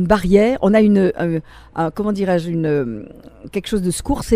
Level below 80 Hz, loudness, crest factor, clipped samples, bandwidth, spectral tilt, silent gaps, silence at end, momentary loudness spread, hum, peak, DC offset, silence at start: -36 dBFS; -18 LUFS; 18 dB; under 0.1%; 15.5 kHz; -6.5 dB/octave; none; 0 s; 14 LU; none; 0 dBFS; under 0.1%; 0 s